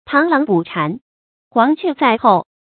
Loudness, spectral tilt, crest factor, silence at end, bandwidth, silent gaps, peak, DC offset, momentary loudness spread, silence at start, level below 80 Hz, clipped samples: -16 LUFS; -11 dB/octave; 16 dB; 0.25 s; 4.6 kHz; 1.01-1.51 s; 0 dBFS; under 0.1%; 8 LU; 0.1 s; -62 dBFS; under 0.1%